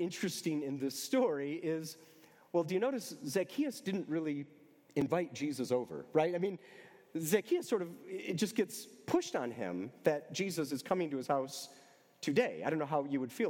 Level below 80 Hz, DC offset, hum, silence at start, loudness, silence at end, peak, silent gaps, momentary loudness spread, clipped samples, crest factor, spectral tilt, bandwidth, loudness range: -82 dBFS; under 0.1%; none; 0 s; -36 LUFS; 0 s; -16 dBFS; none; 10 LU; under 0.1%; 20 dB; -5 dB/octave; 17.5 kHz; 1 LU